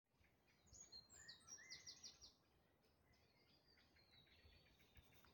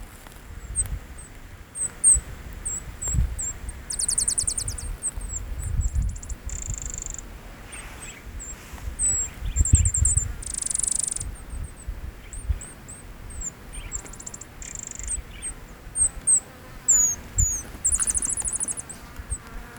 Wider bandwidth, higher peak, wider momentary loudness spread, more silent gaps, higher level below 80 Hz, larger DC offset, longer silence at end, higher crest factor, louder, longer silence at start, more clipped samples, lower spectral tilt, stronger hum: second, 17 kHz vs over 20 kHz; second, -46 dBFS vs -4 dBFS; second, 9 LU vs 20 LU; neither; second, -82 dBFS vs -34 dBFS; neither; about the same, 0 s vs 0 s; about the same, 22 dB vs 24 dB; second, -61 LUFS vs -24 LUFS; about the same, 0.05 s vs 0 s; neither; second, -1 dB/octave vs -2.5 dB/octave; neither